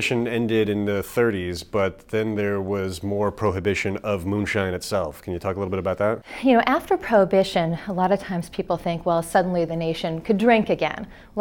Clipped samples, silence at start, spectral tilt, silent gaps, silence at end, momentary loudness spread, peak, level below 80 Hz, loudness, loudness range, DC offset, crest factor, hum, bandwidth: under 0.1%; 0 s; -6 dB/octave; none; 0 s; 8 LU; -4 dBFS; -48 dBFS; -23 LUFS; 3 LU; under 0.1%; 20 dB; none; 18 kHz